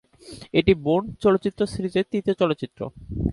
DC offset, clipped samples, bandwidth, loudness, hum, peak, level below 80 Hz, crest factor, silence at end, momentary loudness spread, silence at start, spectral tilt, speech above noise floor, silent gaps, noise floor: under 0.1%; under 0.1%; 11.5 kHz; -23 LUFS; none; -2 dBFS; -42 dBFS; 20 dB; 0 s; 14 LU; 0.25 s; -7 dB/octave; 21 dB; none; -44 dBFS